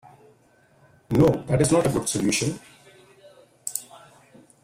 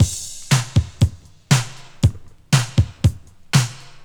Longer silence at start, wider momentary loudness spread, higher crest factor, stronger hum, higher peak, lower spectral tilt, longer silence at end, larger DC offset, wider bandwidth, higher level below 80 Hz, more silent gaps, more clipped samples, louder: first, 1.1 s vs 0 s; first, 13 LU vs 4 LU; about the same, 20 dB vs 18 dB; neither; second, -6 dBFS vs -2 dBFS; about the same, -5 dB/octave vs -4.5 dB/octave; first, 0.65 s vs 0.05 s; neither; second, 16 kHz vs 19.5 kHz; second, -50 dBFS vs -32 dBFS; neither; neither; second, -23 LUFS vs -20 LUFS